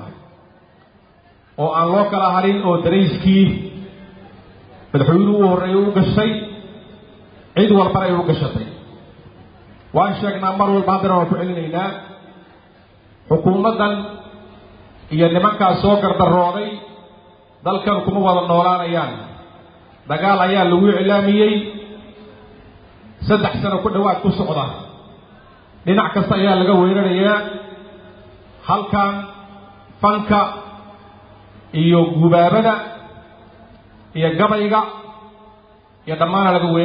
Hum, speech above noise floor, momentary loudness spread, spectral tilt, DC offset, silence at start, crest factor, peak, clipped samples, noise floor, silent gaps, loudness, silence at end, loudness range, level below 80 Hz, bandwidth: none; 35 dB; 19 LU; -12 dB/octave; under 0.1%; 0 s; 16 dB; -2 dBFS; under 0.1%; -50 dBFS; none; -16 LUFS; 0 s; 4 LU; -46 dBFS; 5.2 kHz